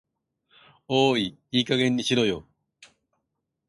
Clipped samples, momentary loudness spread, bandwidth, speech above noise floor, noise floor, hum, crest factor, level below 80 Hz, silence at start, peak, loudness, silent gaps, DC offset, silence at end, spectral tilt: under 0.1%; 5 LU; 11.5 kHz; 57 dB; -80 dBFS; none; 20 dB; -62 dBFS; 0.9 s; -8 dBFS; -24 LUFS; none; under 0.1%; 1.25 s; -5 dB/octave